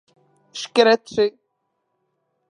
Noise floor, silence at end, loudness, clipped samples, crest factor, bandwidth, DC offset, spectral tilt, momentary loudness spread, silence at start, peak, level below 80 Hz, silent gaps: -74 dBFS; 1.2 s; -19 LUFS; under 0.1%; 22 dB; 10.5 kHz; under 0.1%; -3 dB/octave; 17 LU; 0.55 s; -2 dBFS; -66 dBFS; none